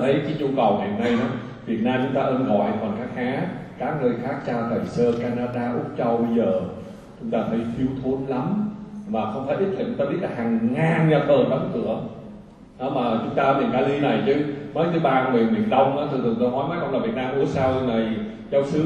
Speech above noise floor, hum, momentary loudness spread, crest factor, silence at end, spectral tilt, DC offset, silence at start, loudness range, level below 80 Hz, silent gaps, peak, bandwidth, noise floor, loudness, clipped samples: 21 dB; none; 8 LU; 16 dB; 0 s; -8 dB/octave; under 0.1%; 0 s; 4 LU; -52 dBFS; none; -6 dBFS; 8.8 kHz; -43 dBFS; -23 LUFS; under 0.1%